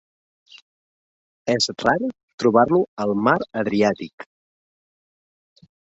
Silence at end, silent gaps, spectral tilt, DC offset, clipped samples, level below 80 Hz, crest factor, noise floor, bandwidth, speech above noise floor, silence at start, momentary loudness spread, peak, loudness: 1.75 s; 2.23-2.28 s, 2.34-2.38 s, 2.88-2.97 s, 4.13-4.18 s; -5 dB/octave; under 0.1%; under 0.1%; -60 dBFS; 22 dB; under -90 dBFS; 8 kHz; over 70 dB; 1.45 s; 13 LU; -2 dBFS; -21 LUFS